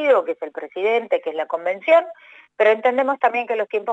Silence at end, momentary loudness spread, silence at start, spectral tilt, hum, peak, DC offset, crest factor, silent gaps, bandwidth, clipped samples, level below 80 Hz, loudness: 0 s; 10 LU; 0 s; -4.5 dB/octave; none; -4 dBFS; under 0.1%; 16 dB; none; 7.8 kHz; under 0.1%; -86 dBFS; -20 LUFS